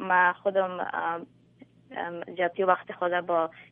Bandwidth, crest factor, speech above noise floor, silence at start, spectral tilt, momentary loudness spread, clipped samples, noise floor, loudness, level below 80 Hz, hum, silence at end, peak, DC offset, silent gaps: 3.8 kHz; 20 dB; 29 dB; 0 s; -8.5 dB/octave; 12 LU; under 0.1%; -56 dBFS; -28 LUFS; -78 dBFS; none; 0.05 s; -8 dBFS; under 0.1%; none